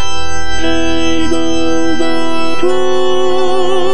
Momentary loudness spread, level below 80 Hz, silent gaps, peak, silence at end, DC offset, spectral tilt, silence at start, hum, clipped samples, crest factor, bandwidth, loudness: 4 LU; -32 dBFS; none; 0 dBFS; 0 s; 40%; -4 dB/octave; 0 s; none; under 0.1%; 12 dB; 10 kHz; -15 LUFS